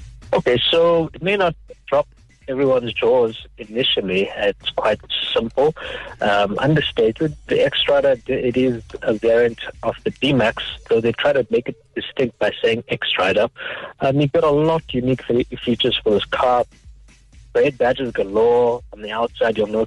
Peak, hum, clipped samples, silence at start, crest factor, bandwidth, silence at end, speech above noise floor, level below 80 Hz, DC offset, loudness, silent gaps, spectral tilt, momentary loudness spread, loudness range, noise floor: -8 dBFS; none; under 0.1%; 0 s; 10 dB; 10.5 kHz; 0 s; 27 dB; -46 dBFS; under 0.1%; -19 LUFS; none; -6 dB/octave; 9 LU; 2 LU; -46 dBFS